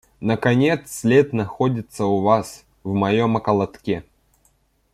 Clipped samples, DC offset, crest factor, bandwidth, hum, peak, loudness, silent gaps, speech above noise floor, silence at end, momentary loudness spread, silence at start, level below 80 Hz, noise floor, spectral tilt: under 0.1%; under 0.1%; 18 dB; 15 kHz; none; -4 dBFS; -20 LUFS; none; 43 dB; 0.9 s; 10 LU; 0.2 s; -54 dBFS; -62 dBFS; -6.5 dB/octave